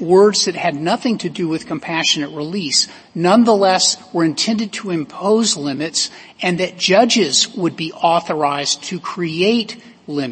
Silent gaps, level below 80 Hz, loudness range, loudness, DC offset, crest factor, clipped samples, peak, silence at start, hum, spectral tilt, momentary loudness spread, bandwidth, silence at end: none; -62 dBFS; 2 LU; -16 LUFS; under 0.1%; 16 dB; under 0.1%; 0 dBFS; 0 s; none; -3.5 dB/octave; 11 LU; 8.8 kHz; 0 s